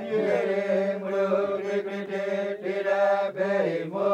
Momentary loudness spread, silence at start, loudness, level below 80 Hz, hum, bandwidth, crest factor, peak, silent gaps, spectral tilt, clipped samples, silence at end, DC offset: 6 LU; 0 s; -26 LUFS; -80 dBFS; none; 9 kHz; 14 dB; -12 dBFS; none; -6.5 dB/octave; under 0.1%; 0 s; under 0.1%